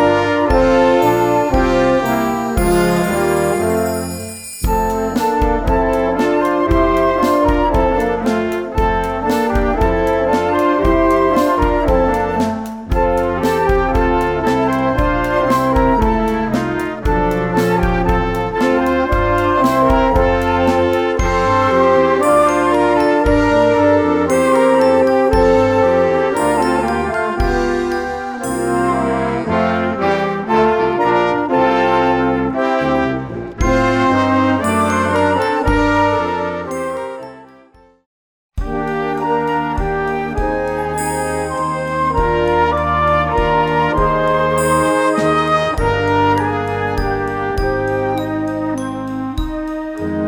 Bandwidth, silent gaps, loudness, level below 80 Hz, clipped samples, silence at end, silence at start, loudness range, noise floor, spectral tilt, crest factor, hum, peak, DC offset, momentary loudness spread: 19.5 kHz; 38.06-38.49 s; -15 LUFS; -26 dBFS; under 0.1%; 0 s; 0 s; 6 LU; -47 dBFS; -6 dB/octave; 14 dB; none; -2 dBFS; under 0.1%; 7 LU